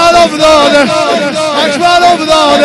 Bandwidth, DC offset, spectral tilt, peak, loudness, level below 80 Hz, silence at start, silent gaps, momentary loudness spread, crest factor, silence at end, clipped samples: 12 kHz; under 0.1%; -3 dB/octave; 0 dBFS; -7 LUFS; -36 dBFS; 0 s; none; 5 LU; 6 dB; 0 s; 1%